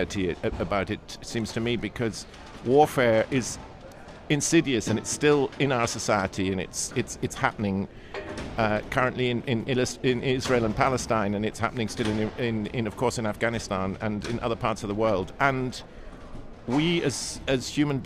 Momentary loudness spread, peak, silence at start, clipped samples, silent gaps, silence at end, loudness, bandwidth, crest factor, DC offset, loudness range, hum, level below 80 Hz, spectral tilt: 13 LU; -6 dBFS; 0 s; under 0.1%; none; 0 s; -26 LUFS; 15.5 kHz; 20 dB; under 0.1%; 3 LU; none; -46 dBFS; -5 dB/octave